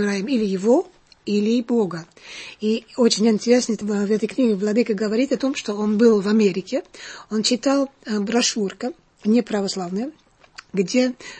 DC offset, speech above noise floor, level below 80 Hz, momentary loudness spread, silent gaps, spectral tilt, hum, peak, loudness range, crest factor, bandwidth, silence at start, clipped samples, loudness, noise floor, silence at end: under 0.1%; 26 dB; -62 dBFS; 12 LU; none; -4.5 dB/octave; none; -4 dBFS; 3 LU; 18 dB; 8.8 kHz; 0 s; under 0.1%; -21 LUFS; -46 dBFS; 0 s